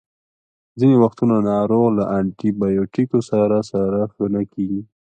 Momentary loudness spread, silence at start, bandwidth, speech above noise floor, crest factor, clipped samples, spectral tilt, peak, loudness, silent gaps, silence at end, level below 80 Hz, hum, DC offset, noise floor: 7 LU; 0.75 s; 9 kHz; over 72 dB; 16 dB; under 0.1%; -9 dB/octave; -2 dBFS; -19 LUFS; none; 0.3 s; -52 dBFS; none; under 0.1%; under -90 dBFS